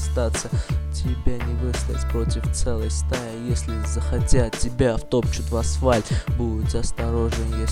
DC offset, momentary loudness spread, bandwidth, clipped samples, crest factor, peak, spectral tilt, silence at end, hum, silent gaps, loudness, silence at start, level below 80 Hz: under 0.1%; 5 LU; 13.5 kHz; under 0.1%; 18 dB; -2 dBFS; -5.5 dB/octave; 0 s; none; none; -24 LUFS; 0 s; -26 dBFS